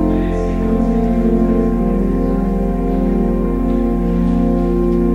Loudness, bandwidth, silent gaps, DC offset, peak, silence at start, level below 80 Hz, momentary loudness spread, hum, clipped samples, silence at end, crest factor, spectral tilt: -16 LUFS; 6.2 kHz; none; under 0.1%; -4 dBFS; 0 s; -20 dBFS; 3 LU; none; under 0.1%; 0 s; 12 dB; -10 dB/octave